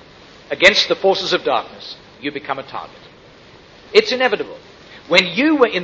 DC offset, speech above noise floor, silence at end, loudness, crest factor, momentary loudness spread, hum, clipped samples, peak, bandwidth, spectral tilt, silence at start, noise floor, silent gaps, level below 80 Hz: under 0.1%; 27 dB; 0 s; -16 LUFS; 18 dB; 20 LU; none; under 0.1%; 0 dBFS; 8.4 kHz; -3.5 dB/octave; 0.5 s; -44 dBFS; none; -56 dBFS